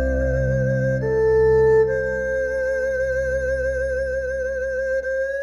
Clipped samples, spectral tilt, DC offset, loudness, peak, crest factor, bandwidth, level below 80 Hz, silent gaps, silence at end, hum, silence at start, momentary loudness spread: under 0.1%; -7.5 dB/octave; under 0.1%; -21 LUFS; -8 dBFS; 12 dB; 11 kHz; -32 dBFS; none; 0 s; none; 0 s; 8 LU